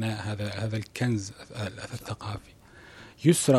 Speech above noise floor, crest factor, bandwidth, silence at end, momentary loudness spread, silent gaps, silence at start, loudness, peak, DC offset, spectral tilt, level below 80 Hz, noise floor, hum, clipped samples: 22 dB; 22 dB; 14 kHz; 0 s; 23 LU; none; 0 s; -31 LUFS; -6 dBFS; under 0.1%; -5.5 dB/octave; -58 dBFS; -50 dBFS; none; under 0.1%